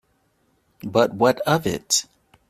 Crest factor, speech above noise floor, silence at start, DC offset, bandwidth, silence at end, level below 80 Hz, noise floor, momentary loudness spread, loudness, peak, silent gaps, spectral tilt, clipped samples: 20 dB; 45 dB; 0.85 s; under 0.1%; 16 kHz; 0.45 s; -56 dBFS; -66 dBFS; 5 LU; -21 LUFS; -2 dBFS; none; -3.5 dB/octave; under 0.1%